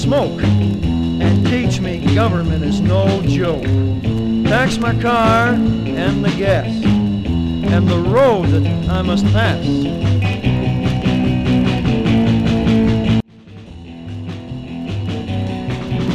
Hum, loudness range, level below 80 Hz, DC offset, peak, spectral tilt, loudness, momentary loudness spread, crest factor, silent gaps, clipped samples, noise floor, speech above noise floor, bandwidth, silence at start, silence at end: none; 2 LU; -30 dBFS; 0.2%; -2 dBFS; -7.5 dB/octave; -16 LUFS; 9 LU; 14 dB; none; under 0.1%; -37 dBFS; 23 dB; 10.5 kHz; 0 s; 0 s